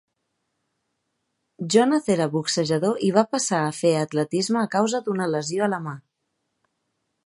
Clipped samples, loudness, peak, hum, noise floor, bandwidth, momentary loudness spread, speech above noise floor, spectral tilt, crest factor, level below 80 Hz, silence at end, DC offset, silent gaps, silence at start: under 0.1%; -22 LUFS; -4 dBFS; none; -77 dBFS; 11.5 kHz; 5 LU; 55 dB; -4.5 dB/octave; 20 dB; -70 dBFS; 1.25 s; under 0.1%; none; 1.6 s